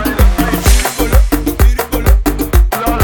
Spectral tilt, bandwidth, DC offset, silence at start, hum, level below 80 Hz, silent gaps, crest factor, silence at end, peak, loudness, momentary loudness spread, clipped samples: -5 dB/octave; over 20 kHz; 0.3%; 0 s; none; -12 dBFS; none; 10 dB; 0 s; 0 dBFS; -13 LUFS; 2 LU; 0.2%